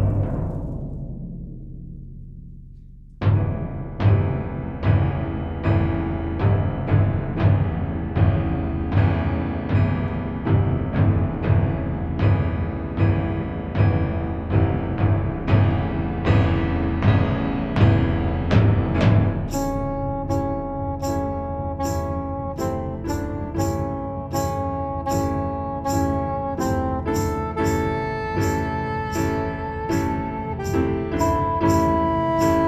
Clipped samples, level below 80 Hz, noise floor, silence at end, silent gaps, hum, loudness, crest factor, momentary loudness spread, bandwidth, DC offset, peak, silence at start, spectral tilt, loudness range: under 0.1%; -32 dBFS; -42 dBFS; 0 s; none; none; -23 LUFS; 18 dB; 8 LU; 13.5 kHz; under 0.1%; -4 dBFS; 0 s; -7.5 dB/octave; 6 LU